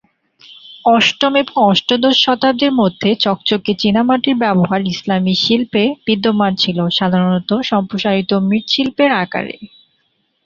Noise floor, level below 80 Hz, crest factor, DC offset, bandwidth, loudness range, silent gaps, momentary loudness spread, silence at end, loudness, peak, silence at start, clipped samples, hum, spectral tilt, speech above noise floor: -64 dBFS; -54 dBFS; 14 dB; under 0.1%; 7.4 kHz; 2 LU; none; 5 LU; 0.8 s; -14 LUFS; 0 dBFS; 0.5 s; under 0.1%; none; -5.5 dB/octave; 49 dB